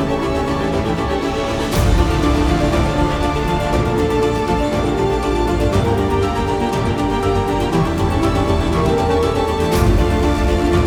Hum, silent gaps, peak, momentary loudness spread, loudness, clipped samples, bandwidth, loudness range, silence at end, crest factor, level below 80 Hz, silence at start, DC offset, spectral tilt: none; none; -2 dBFS; 3 LU; -17 LUFS; under 0.1%; over 20 kHz; 1 LU; 0 s; 14 dB; -24 dBFS; 0 s; under 0.1%; -6.5 dB/octave